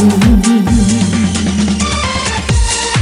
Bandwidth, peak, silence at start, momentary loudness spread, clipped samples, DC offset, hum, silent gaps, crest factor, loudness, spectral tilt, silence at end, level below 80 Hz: 14.5 kHz; 0 dBFS; 0 s; 5 LU; under 0.1%; under 0.1%; none; none; 10 dB; -12 LUFS; -4.5 dB/octave; 0 s; -20 dBFS